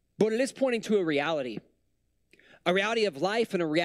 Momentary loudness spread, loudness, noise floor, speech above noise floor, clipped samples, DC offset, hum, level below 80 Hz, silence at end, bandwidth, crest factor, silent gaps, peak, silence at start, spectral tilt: 7 LU; -28 LUFS; -75 dBFS; 48 dB; under 0.1%; under 0.1%; none; -72 dBFS; 0 s; 13.5 kHz; 20 dB; none; -10 dBFS; 0.2 s; -5 dB/octave